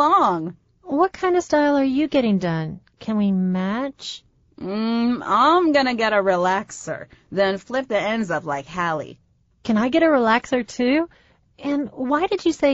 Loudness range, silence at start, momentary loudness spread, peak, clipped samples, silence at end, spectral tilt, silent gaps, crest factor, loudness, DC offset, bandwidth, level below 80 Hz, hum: 4 LU; 0 s; 15 LU; -4 dBFS; under 0.1%; 0 s; -4.5 dB/octave; none; 16 dB; -21 LUFS; under 0.1%; 8 kHz; -56 dBFS; none